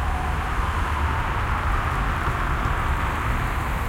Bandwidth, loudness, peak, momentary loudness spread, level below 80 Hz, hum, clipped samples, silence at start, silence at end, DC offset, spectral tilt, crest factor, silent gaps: 16.5 kHz; -25 LUFS; -10 dBFS; 1 LU; -26 dBFS; none; under 0.1%; 0 s; 0 s; under 0.1%; -5.5 dB/octave; 14 dB; none